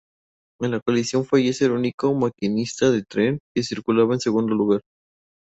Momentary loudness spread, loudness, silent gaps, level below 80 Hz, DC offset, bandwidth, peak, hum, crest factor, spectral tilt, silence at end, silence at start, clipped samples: 6 LU; -22 LUFS; 0.82-0.86 s, 1.94-1.98 s, 3.40-3.55 s; -60 dBFS; under 0.1%; 8.2 kHz; -6 dBFS; none; 16 dB; -6 dB/octave; 0.8 s; 0.6 s; under 0.1%